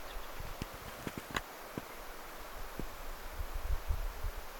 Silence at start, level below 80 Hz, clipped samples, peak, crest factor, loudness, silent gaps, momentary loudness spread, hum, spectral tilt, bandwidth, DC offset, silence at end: 0 s; -42 dBFS; under 0.1%; -18 dBFS; 24 dB; -44 LUFS; none; 7 LU; none; -4 dB/octave; 17.5 kHz; under 0.1%; 0 s